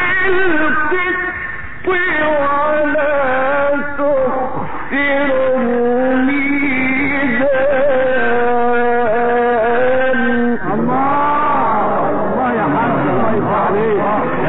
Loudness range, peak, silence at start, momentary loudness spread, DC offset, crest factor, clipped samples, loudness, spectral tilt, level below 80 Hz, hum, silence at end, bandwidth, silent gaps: 1 LU; -4 dBFS; 0 s; 3 LU; 8%; 10 dB; under 0.1%; -15 LUFS; -4 dB/octave; -42 dBFS; none; 0 s; 4.1 kHz; none